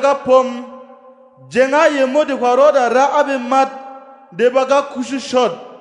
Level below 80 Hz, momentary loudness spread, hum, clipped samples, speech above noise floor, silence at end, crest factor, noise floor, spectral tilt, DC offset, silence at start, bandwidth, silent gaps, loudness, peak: -66 dBFS; 13 LU; none; under 0.1%; 29 dB; 0.05 s; 16 dB; -43 dBFS; -3.5 dB/octave; under 0.1%; 0 s; 10.5 kHz; none; -15 LUFS; 0 dBFS